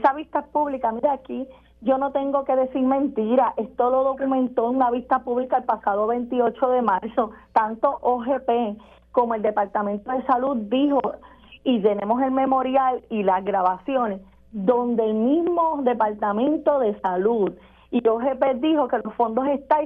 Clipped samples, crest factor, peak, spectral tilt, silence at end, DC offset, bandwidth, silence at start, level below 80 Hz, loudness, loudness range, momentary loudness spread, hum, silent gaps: under 0.1%; 18 dB; -4 dBFS; -9 dB/octave; 0 s; under 0.1%; 4.5 kHz; 0 s; -56 dBFS; -22 LUFS; 1 LU; 5 LU; none; none